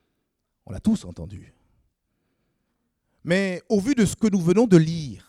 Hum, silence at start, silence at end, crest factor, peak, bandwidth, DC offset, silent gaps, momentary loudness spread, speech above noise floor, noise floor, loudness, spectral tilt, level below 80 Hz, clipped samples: none; 0.7 s; 0.1 s; 22 dB; -2 dBFS; 14 kHz; under 0.1%; none; 21 LU; 55 dB; -76 dBFS; -21 LUFS; -6.5 dB/octave; -52 dBFS; under 0.1%